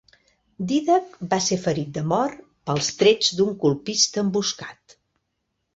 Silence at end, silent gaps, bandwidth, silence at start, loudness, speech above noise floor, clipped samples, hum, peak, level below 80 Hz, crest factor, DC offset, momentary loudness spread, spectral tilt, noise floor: 1 s; none; 8 kHz; 0.6 s; -22 LUFS; 54 dB; under 0.1%; none; -4 dBFS; -60 dBFS; 20 dB; under 0.1%; 10 LU; -4 dB/octave; -76 dBFS